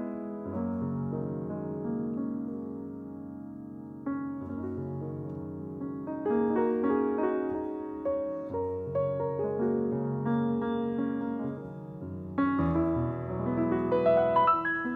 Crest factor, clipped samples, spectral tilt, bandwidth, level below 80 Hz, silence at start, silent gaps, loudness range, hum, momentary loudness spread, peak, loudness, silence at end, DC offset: 18 dB; under 0.1%; -10.5 dB/octave; 4.3 kHz; -56 dBFS; 0 s; none; 8 LU; none; 13 LU; -14 dBFS; -31 LUFS; 0 s; under 0.1%